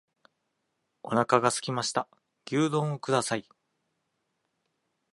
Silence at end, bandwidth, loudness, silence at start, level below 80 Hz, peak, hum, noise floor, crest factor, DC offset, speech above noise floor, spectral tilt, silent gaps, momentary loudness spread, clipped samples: 1.75 s; 11.5 kHz; -28 LUFS; 1.05 s; -74 dBFS; -6 dBFS; none; -79 dBFS; 26 dB; under 0.1%; 52 dB; -4.5 dB/octave; none; 10 LU; under 0.1%